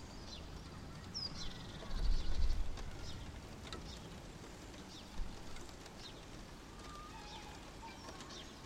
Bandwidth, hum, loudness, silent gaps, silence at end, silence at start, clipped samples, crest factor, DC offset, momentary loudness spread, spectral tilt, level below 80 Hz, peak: 12.5 kHz; none; -48 LUFS; none; 0 s; 0 s; under 0.1%; 20 dB; under 0.1%; 10 LU; -4 dB/octave; -44 dBFS; -22 dBFS